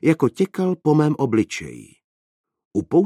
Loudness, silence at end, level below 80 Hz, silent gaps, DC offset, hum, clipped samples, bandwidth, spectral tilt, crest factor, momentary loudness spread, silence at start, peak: -21 LUFS; 0 s; -58 dBFS; 2.04-2.44 s, 2.65-2.71 s; under 0.1%; none; under 0.1%; 13 kHz; -7.5 dB/octave; 16 dB; 10 LU; 0.05 s; -4 dBFS